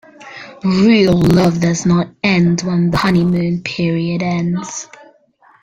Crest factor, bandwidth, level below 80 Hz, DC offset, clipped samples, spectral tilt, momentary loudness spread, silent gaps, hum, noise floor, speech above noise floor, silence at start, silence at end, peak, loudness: 14 dB; 9 kHz; -42 dBFS; under 0.1%; under 0.1%; -6 dB/octave; 16 LU; none; none; -51 dBFS; 37 dB; 0.2 s; 0.75 s; 0 dBFS; -14 LUFS